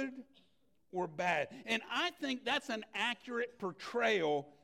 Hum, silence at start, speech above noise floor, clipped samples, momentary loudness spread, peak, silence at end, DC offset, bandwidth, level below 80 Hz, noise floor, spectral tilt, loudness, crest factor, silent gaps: none; 0 s; 39 dB; under 0.1%; 9 LU; -20 dBFS; 0.15 s; under 0.1%; 16 kHz; -80 dBFS; -76 dBFS; -3.5 dB/octave; -36 LUFS; 18 dB; none